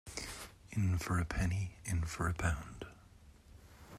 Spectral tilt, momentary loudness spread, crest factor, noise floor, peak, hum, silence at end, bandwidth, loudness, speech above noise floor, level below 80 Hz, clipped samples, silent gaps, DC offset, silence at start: -5.5 dB/octave; 15 LU; 20 dB; -60 dBFS; -18 dBFS; none; 0 s; 14.5 kHz; -37 LUFS; 24 dB; -50 dBFS; under 0.1%; none; under 0.1%; 0.05 s